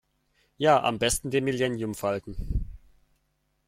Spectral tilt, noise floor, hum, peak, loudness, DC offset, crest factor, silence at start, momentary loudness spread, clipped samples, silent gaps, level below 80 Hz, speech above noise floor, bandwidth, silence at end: -4 dB/octave; -73 dBFS; none; -8 dBFS; -27 LUFS; under 0.1%; 20 dB; 0.6 s; 12 LU; under 0.1%; none; -40 dBFS; 47 dB; 16.5 kHz; 0.9 s